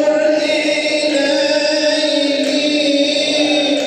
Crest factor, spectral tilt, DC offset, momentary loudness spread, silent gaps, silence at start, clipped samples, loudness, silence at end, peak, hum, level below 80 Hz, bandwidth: 12 dB; -2 dB/octave; under 0.1%; 1 LU; none; 0 s; under 0.1%; -14 LUFS; 0 s; -2 dBFS; none; -72 dBFS; 10.5 kHz